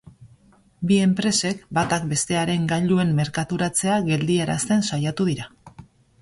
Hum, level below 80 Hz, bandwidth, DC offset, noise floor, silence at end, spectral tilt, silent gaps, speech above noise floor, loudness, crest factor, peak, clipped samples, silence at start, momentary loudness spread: none; -54 dBFS; 11.5 kHz; under 0.1%; -55 dBFS; 0.4 s; -5 dB/octave; none; 34 dB; -22 LUFS; 16 dB; -8 dBFS; under 0.1%; 0.05 s; 5 LU